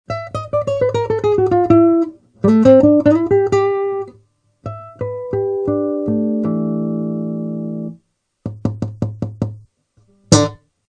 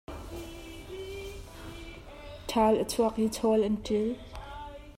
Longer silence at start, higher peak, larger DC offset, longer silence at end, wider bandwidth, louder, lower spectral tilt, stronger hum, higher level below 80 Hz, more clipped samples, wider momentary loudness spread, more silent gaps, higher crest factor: about the same, 0.1 s vs 0.1 s; first, 0 dBFS vs -14 dBFS; neither; first, 0.35 s vs 0.05 s; second, 11 kHz vs 16 kHz; first, -16 LUFS vs -29 LUFS; first, -6.5 dB/octave vs -5 dB/octave; neither; about the same, -46 dBFS vs -48 dBFS; neither; second, 15 LU vs 19 LU; neither; about the same, 16 dB vs 18 dB